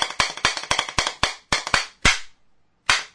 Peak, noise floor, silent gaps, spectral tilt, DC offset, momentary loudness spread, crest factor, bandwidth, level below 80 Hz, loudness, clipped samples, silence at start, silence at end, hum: 0 dBFS; -62 dBFS; none; -1 dB/octave; under 0.1%; 6 LU; 24 dB; 11 kHz; -40 dBFS; -22 LUFS; under 0.1%; 0 s; 0.05 s; none